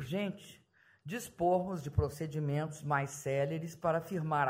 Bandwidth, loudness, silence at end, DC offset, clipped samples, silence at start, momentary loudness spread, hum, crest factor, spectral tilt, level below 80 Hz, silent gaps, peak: 16 kHz; -35 LUFS; 0 s; under 0.1%; under 0.1%; 0 s; 11 LU; none; 18 dB; -6.5 dB/octave; -54 dBFS; none; -18 dBFS